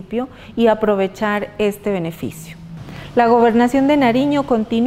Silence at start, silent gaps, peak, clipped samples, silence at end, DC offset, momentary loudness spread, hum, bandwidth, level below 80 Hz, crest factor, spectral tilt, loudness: 0 s; none; -2 dBFS; under 0.1%; 0 s; under 0.1%; 19 LU; none; 16 kHz; -46 dBFS; 16 dB; -6.5 dB/octave; -17 LUFS